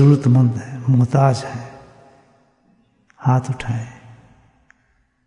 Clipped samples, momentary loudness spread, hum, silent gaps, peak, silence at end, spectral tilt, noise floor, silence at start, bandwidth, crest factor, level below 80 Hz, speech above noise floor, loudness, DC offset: under 0.1%; 18 LU; none; none; -2 dBFS; 1.35 s; -8.5 dB/octave; -62 dBFS; 0 s; 10.5 kHz; 16 dB; -54 dBFS; 47 dB; -18 LUFS; under 0.1%